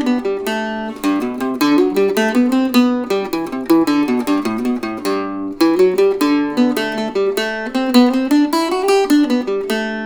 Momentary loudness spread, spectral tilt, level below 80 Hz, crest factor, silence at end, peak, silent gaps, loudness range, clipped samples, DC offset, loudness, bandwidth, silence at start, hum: 7 LU; -4.5 dB/octave; -52 dBFS; 16 dB; 0 s; 0 dBFS; none; 1 LU; under 0.1%; under 0.1%; -16 LUFS; over 20 kHz; 0 s; none